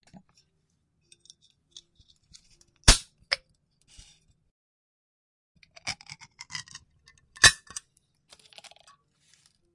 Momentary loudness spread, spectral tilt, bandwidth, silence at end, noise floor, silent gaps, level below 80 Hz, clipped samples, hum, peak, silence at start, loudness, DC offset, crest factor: 28 LU; -1 dB/octave; 11.5 kHz; 2.2 s; -73 dBFS; 4.51-5.55 s; -38 dBFS; under 0.1%; none; 0 dBFS; 2.85 s; -24 LUFS; under 0.1%; 32 dB